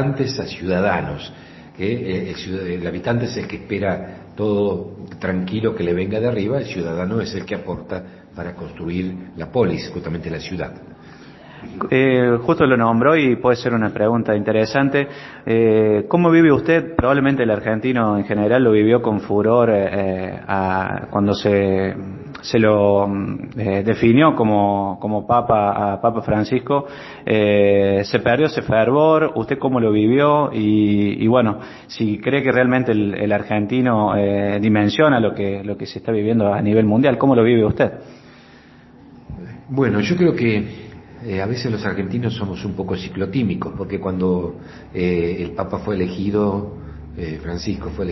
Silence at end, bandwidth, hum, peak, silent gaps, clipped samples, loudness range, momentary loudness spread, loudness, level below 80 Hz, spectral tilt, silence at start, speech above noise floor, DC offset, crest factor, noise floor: 0 s; 6 kHz; none; 0 dBFS; none; under 0.1%; 7 LU; 14 LU; -18 LUFS; -42 dBFS; -8 dB/octave; 0 s; 27 dB; under 0.1%; 18 dB; -45 dBFS